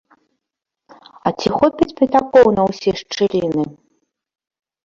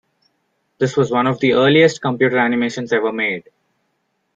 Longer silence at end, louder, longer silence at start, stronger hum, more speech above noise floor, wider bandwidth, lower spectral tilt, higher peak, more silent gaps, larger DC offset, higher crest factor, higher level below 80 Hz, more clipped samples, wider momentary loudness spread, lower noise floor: first, 1.1 s vs 0.95 s; about the same, -17 LUFS vs -16 LUFS; first, 1.25 s vs 0.8 s; neither; first, 67 dB vs 53 dB; about the same, 7.6 kHz vs 7.8 kHz; about the same, -6 dB/octave vs -5.5 dB/octave; about the same, 0 dBFS vs -2 dBFS; neither; neither; about the same, 18 dB vs 16 dB; first, -50 dBFS vs -60 dBFS; neither; first, 11 LU vs 8 LU; first, -82 dBFS vs -69 dBFS